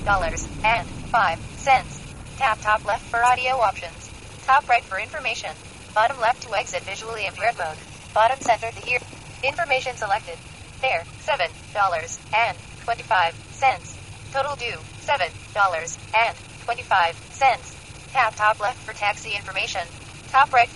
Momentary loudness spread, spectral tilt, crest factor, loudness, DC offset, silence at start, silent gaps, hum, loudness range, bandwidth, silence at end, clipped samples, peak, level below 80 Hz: 14 LU; -2.5 dB/octave; 20 dB; -23 LUFS; 0.1%; 0 s; none; none; 3 LU; 11.5 kHz; 0 s; under 0.1%; -4 dBFS; -44 dBFS